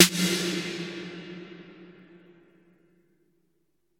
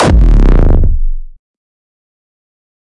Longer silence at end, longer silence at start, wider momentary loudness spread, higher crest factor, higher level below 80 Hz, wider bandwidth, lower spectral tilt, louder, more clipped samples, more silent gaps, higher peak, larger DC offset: first, 2.1 s vs 1.55 s; about the same, 0 s vs 0 s; first, 24 LU vs 15 LU; first, 28 dB vs 10 dB; second, -74 dBFS vs -10 dBFS; first, 17 kHz vs 10 kHz; second, -2.5 dB/octave vs -7 dB/octave; second, -27 LUFS vs -11 LUFS; neither; neither; about the same, -2 dBFS vs 0 dBFS; neither